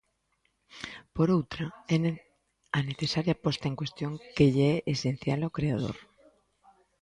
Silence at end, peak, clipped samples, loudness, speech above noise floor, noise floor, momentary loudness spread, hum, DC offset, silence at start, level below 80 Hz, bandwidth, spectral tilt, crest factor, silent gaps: 1 s; -10 dBFS; under 0.1%; -29 LUFS; 46 dB; -75 dBFS; 13 LU; none; under 0.1%; 0.75 s; -56 dBFS; 10.5 kHz; -6.5 dB/octave; 20 dB; none